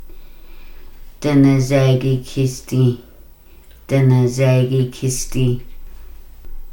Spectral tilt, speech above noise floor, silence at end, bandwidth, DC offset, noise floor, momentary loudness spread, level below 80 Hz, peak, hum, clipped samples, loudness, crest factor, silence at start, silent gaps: -7 dB/octave; 27 dB; 0 s; 17 kHz; under 0.1%; -42 dBFS; 8 LU; -34 dBFS; -2 dBFS; none; under 0.1%; -17 LUFS; 16 dB; 0 s; none